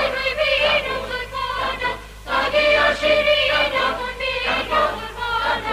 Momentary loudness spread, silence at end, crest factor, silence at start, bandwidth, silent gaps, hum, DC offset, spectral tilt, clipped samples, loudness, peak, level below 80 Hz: 9 LU; 0 s; 14 dB; 0 s; 15.5 kHz; none; none; under 0.1%; -3 dB/octave; under 0.1%; -19 LUFS; -6 dBFS; -40 dBFS